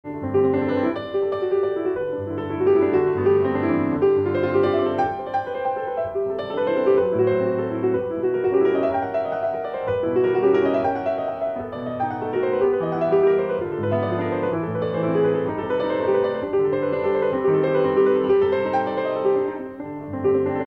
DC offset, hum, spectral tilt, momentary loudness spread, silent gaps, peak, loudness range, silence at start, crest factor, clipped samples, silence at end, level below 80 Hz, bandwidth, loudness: under 0.1%; none; -9 dB/octave; 7 LU; none; -8 dBFS; 2 LU; 0.05 s; 14 dB; under 0.1%; 0 s; -56 dBFS; 4.8 kHz; -22 LUFS